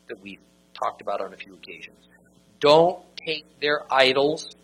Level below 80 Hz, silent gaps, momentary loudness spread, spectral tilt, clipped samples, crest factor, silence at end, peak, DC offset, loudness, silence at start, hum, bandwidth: -66 dBFS; none; 23 LU; -4 dB/octave; under 0.1%; 24 dB; 0.1 s; -2 dBFS; under 0.1%; -22 LUFS; 0.1 s; none; 12 kHz